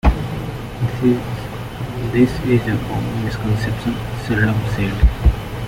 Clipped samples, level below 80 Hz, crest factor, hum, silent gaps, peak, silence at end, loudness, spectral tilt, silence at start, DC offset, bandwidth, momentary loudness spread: under 0.1%; -24 dBFS; 16 dB; none; none; -2 dBFS; 0 s; -20 LUFS; -7.5 dB/octave; 0.05 s; under 0.1%; 16.5 kHz; 10 LU